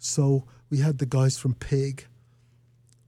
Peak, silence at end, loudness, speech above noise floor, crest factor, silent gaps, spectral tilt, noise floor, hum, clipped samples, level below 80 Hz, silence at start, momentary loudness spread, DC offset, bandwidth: -12 dBFS; 1.05 s; -26 LUFS; 35 dB; 14 dB; none; -6 dB/octave; -60 dBFS; none; under 0.1%; -52 dBFS; 0 s; 7 LU; under 0.1%; 12.5 kHz